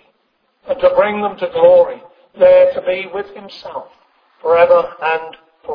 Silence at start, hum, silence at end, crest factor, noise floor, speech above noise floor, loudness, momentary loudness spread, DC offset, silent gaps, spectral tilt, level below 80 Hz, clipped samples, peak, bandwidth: 0.65 s; none; 0 s; 14 dB; -63 dBFS; 50 dB; -13 LUFS; 21 LU; under 0.1%; none; -7 dB/octave; -54 dBFS; under 0.1%; 0 dBFS; 5.2 kHz